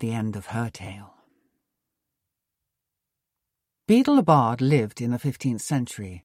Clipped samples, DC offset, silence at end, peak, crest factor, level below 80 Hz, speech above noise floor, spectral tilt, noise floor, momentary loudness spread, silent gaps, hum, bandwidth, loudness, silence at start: under 0.1%; under 0.1%; 0.05 s; -6 dBFS; 20 dB; -60 dBFS; 62 dB; -7 dB/octave; -84 dBFS; 15 LU; none; none; 15.5 kHz; -23 LUFS; 0 s